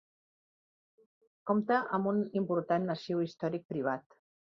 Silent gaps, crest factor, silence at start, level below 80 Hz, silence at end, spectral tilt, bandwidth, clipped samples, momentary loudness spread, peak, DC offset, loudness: 3.65-3.69 s; 18 dB; 1.45 s; -78 dBFS; 0.4 s; -8 dB/octave; 6.8 kHz; under 0.1%; 7 LU; -16 dBFS; under 0.1%; -33 LUFS